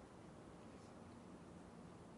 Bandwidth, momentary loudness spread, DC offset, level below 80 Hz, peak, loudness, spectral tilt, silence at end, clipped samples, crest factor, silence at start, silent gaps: 11.5 kHz; 1 LU; under 0.1%; -74 dBFS; -46 dBFS; -59 LUFS; -6 dB/octave; 0 s; under 0.1%; 12 dB; 0 s; none